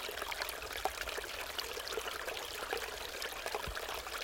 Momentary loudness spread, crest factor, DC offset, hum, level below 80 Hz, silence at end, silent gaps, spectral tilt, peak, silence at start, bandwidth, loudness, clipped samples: 2 LU; 24 dB; under 0.1%; none; -56 dBFS; 0 s; none; -1 dB/octave; -16 dBFS; 0 s; 17 kHz; -40 LUFS; under 0.1%